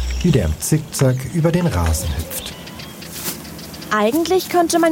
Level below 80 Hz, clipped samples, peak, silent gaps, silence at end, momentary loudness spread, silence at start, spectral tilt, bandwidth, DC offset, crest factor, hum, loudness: -30 dBFS; under 0.1%; -4 dBFS; none; 0 s; 15 LU; 0 s; -5.5 dB/octave; 17 kHz; under 0.1%; 16 dB; none; -19 LUFS